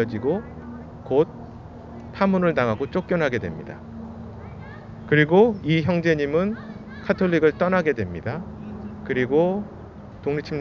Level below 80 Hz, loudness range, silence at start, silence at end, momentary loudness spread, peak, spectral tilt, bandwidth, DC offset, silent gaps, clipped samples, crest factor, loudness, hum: -46 dBFS; 5 LU; 0 s; 0 s; 19 LU; -4 dBFS; -8 dB/octave; 6.8 kHz; under 0.1%; none; under 0.1%; 20 dB; -22 LUFS; none